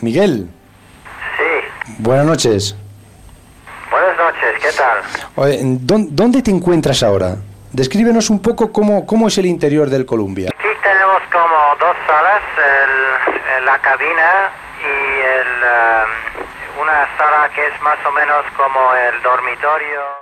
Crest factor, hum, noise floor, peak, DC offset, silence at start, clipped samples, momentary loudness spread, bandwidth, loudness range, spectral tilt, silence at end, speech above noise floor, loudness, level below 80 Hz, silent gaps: 12 dB; none; -41 dBFS; -2 dBFS; under 0.1%; 0 s; under 0.1%; 9 LU; 15 kHz; 4 LU; -5 dB/octave; 0 s; 27 dB; -13 LUFS; -46 dBFS; none